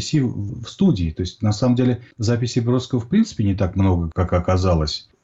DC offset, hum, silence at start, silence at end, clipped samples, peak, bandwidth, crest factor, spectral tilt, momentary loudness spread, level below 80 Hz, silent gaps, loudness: under 0.1%; none; 0 s; 0.25 s; under 0.1%; -8 dBFS; 8 kHz; 12 dB; -7 dB/octave; 6 LU; -36 dBFS; none; -20 LUFS